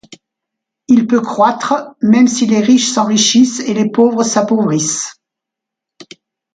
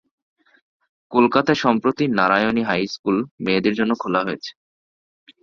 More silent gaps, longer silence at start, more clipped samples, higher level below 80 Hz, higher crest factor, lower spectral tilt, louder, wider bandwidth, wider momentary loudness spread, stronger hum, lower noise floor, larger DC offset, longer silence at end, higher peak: second, none vs 2.99-3.04 s, 3.31-3.38 s; second, 0.9 s vs 1.1 s; neither; about the same, -60 dBFS vs -58 dBFS; second, 14 dB vs 20 dB; second, -4 dB/octave vs -6 dB/octave; first, -12 LUFS vs -19 LUFS; first, 9.4 kHz vs 7.2 kHz; about the same, 7 LU vs 6 LU; neither; second, -82 dBFS vs under -90 dBFS; neither; second, 0.5 s vs 0.9 s; about the same, 0 dBFS vs 0 dBFS